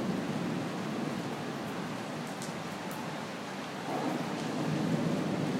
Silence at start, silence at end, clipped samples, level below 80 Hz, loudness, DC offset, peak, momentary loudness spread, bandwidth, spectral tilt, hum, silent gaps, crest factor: 0 s; 0 s; under 0.1%; -70 dBFS; -35 LUFS; under 0.1%; -18 dBFS; 7 LU; 16 kHz; -5.5 dB/octave; none; none; 16 dB